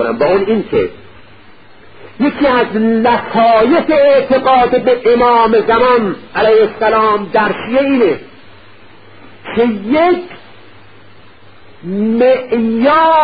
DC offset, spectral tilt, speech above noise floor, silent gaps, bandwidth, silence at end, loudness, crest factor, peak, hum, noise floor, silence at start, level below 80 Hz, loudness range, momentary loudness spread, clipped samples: 1%; -11 dB/octave; 31 dB; none; 5 kHz; 0 s; -12 LUFS; 12 dB; 0 dBFS; none; -42 dBFS; 0 s; -44 dBFS; 8 LU; 8 LU; under 0.1%